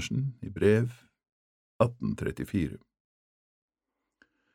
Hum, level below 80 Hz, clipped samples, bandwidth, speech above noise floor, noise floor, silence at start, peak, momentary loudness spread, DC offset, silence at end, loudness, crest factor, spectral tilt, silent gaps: none; -54 dBFS; under 0.1%; 15 kHz; 57 dB; -86 dBFS; 0 s; -8 dBFS; 11 LU; under 0.1%; 1.75 s; -30 LUFS; 24 dB; -7 dB/octave; 1.32-1.80 s